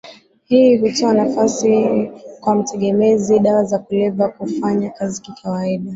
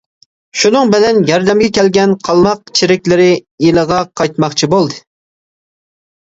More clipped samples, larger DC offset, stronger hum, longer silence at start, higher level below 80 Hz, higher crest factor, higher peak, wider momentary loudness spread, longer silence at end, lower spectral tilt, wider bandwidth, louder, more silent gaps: neither; neither; neither; second, 0.05 s vs 0.55 s; second, -58 dBFS vs -46 dBFS; about the same, 14 dB vs 12 dB; about the same, -2 dBFS vs 0 dBFS; first, 10 LU vs 5 LU; second, 0 s vs 1.3 s; about the same, -6 dB/octave vs -5 dB/octave; about the same, 8 kHz vs 8 kHz; second, -16 LUFS vs -11 LUFS; second, none vs 3.51-3.58 s